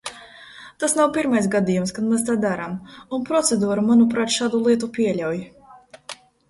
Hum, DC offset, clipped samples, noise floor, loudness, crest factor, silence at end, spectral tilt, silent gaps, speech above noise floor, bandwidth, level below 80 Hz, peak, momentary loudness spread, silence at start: none; under 0.1%; under 0.1%; -47 dBFS; -21 LUFS; 16 dB; 0.35 s; -4.5 dB/octave; none; 27 dB; 11.5 kHz; -58 dBFS; -6 dBFS; 21 LU; 0.05 s